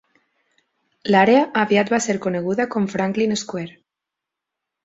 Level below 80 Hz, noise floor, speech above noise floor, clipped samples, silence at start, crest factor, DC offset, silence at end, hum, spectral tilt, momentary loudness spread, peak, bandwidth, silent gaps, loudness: -62 dBFS; -85 dBFS; 66 dB; under 0.1%; 1.05 s; 18 dB; under 0.1%; 1.15 s; none; -5 dB/octave; 15 LU; -2 dBFS; 8 kHz; none; -19 LUFS